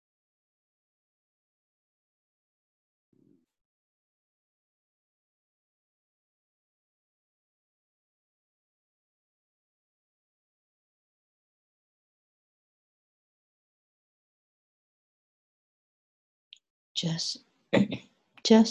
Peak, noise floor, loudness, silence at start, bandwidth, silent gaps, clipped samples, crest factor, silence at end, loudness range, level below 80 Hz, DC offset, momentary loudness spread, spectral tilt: -8 dBFS; under -90 dBFS; -28 LUFS; 16.95 s; 9 kHz; none; under 0.1%; 28 dB; 0 s; 12 LU; -76 dBFS; under 0.1%; 16 LU; -5 dB/octave